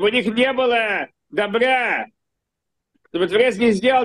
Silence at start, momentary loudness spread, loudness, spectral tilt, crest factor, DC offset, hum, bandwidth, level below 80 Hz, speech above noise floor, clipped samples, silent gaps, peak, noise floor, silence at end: 0 s; 9 LU; -19 LUFS; -4.5 dB/octave; 14 dB; under 0.1%; none; 10.5 kHz; -58 dBFS; 62 dB; under 0.1%; none; -6 dBFS; -80 dBFS; 0 s